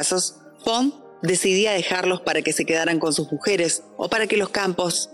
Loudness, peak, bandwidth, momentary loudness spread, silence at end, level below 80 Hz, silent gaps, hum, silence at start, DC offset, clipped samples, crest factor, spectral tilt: -22 LUFS; -6 dBFS; 15 kHz; 5 LU; 0 s; -62 dBFS; none; none; 0 s; under 0.1%; under 0.1%; 16 dB; -3 dB/octave